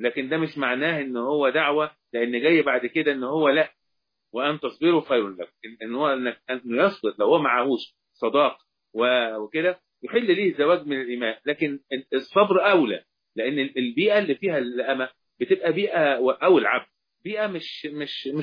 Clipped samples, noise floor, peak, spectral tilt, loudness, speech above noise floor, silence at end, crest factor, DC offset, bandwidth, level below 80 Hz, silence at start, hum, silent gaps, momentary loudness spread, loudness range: under 0.1%; -80 dBFS; -6 dBFS; -7.5 dB/octave; -23 LUFS; 57 dB; 0 s; 18 dB; under 0.1%; 5.2 kHz; -76 dBFS; 0 s; none; none; 12 LU; 2 LU